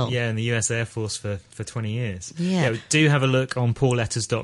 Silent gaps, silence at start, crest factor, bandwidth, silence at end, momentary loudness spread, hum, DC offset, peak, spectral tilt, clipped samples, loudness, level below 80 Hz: none; 0 s; 18 dB; 11.5 kHz; 0 s; 12 LU; none; under 0.1%; -4 dBFS; -5 dB/octave; under 0.1%; -23 LUFS; -52 dBFS